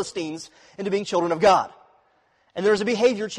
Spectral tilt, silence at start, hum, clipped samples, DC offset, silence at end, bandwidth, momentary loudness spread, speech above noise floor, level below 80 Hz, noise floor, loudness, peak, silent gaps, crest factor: -4.5 dB/octave; 0 s; none; under 0.1%; under 0.1%; 0 s; 11 kHz; 18 LU; 41 dB; -60 dBFS; -64 dBFS; -22 LUFS; -6 dBFS; none; 16 dB